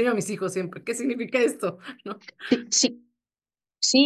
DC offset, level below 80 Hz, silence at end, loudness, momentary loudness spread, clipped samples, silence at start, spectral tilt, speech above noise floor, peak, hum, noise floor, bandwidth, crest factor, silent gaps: under 0.1%; -72 dBFS; 0 s; -25 LUFS; 16 LU; under 0.1%; 0 s; -2.5 dB/octave; over 64 dB; -8 dBFS; none; under -90 dBFS; 12.5 kHz; 18 dB; none